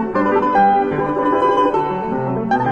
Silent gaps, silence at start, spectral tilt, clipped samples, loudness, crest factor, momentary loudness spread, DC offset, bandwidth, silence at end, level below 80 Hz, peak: none; 0 s; -8 dB/octave; under 0.1%; -16 LUFS; 12 dB; 7 LU; under 0.1%; 8.6 kHz; 0 s; -46 dBFS; -4 dBFS